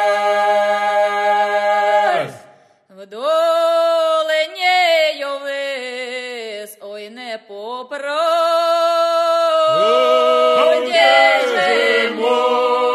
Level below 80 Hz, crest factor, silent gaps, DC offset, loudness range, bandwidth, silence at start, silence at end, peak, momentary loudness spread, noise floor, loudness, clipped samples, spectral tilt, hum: -88 dBFS; 16 dB; none; under 0.1%; 8 LU; 13 kHz; 0 s; 0 s; 0 dBFS; 16 LU; -48 dBFS; -15 LUFS; under 0.1%; -2 dB/octave; none